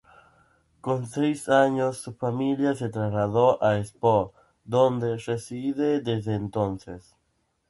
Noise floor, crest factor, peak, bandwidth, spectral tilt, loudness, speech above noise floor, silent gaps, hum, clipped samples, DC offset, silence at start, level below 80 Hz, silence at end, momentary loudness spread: -72 dBFS; 20 dB; -6 dBFS; 11.5 kHz; -7 dB/octave; -25 LUFS; 48 dB; none; none; under 0.1%; under 0.1%; 0.85 s; -56 dBFS; 0.7 s; 10 LU